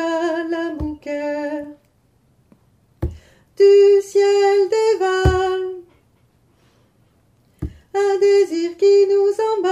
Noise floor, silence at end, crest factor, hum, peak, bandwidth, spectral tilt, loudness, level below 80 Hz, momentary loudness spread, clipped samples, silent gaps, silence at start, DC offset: -59 dBFS; 0 s; 16 dB; none; -2 dBFS; 10.5 kHz; -6 dB/octave; -17 LUFS; -36 dBFS; 17 LU; under 0.1%; none; 0 s; under 0.1%